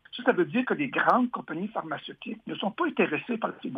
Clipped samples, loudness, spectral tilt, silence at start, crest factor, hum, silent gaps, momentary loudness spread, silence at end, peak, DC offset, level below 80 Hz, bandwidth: under 0.1%; -28 LUFS; -7.5 dB/octave; 0.15 s; 20 dB; none; none; 13 LU; 0 s; -8 dBFS; under 0.1%; -76 dBFS; 5.6 kHz